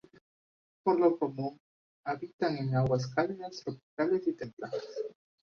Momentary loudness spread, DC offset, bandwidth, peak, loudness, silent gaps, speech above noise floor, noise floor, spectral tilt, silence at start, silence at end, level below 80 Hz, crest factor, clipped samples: 14 LU; under 0.1%; 7 kHz; -14 dBFS; -33 LUFS; 1.60-2.04 s, 2.33-2.39 s, 3.83-3.97 s, 4.53-4.57 s; over 59 dB; under -90 dBFS; -7.5 dB/octave; 0.85 s; 0.45 s; -66 dBFS; 20 dB; under 0.1%